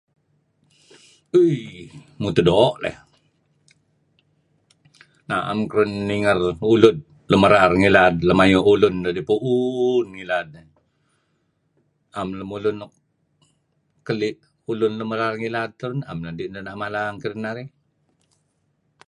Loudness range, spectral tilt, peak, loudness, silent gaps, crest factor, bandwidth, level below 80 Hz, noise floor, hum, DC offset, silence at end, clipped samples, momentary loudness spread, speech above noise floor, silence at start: 14 LU; -6.5 dB/octave; 0 dBFS; -20 LUFS; none; 22 dB; 11 kHz; -48 dBFS; -69 dBFS; none; under 0.1%; 1.4 s; under 0.1%; 17 LU; 49 dB; 1.35 s